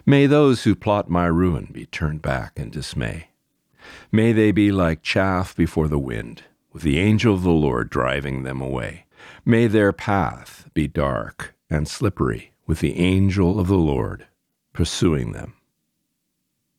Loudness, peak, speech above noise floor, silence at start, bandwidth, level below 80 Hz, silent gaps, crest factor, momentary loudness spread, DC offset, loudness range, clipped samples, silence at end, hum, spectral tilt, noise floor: -21 LUFS; -4 dBFS; 55 dB; 0.05 s; 14.5 kHz; -38 dBFS; none; 18 dB; 14 LU; under 0.1%; 3 LU; under 0.1%; 1.25 s; none; -7 dB/octave; -75 dBFS